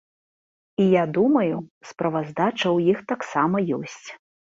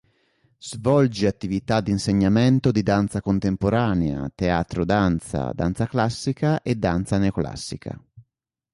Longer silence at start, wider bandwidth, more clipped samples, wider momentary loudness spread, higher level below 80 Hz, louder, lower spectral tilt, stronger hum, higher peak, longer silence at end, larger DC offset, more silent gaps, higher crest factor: first, 0.8 s vs 0.65 s; second, 7.8 kHz vs 11.5 kHz; neither; first, 15 LU vs 10 LU; second, -66 dBFS vs -42 dBFS; about the same, -22 LUFS vs -22 LUFS; about the same, -6.5 dB/octave vs -7 dB/octave; neither; about the same, -6 dBFS vs -6 dBFS; second, 0.35 s vs 0.5 s; neither; first, 1.71-1.81 s vs none; about the same, 16 dB vs 16 dB